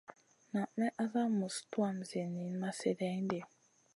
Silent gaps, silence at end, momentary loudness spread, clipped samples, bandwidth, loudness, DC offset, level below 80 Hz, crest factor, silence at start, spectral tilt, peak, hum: none; 0.5 s; 6 LU; under 0.1%; 11.5 kHz; -38 LUFS; under 0.1%; -84 dBFS; 18 dB; 0.1 s; -6 dB/octave; -20 dBFS; none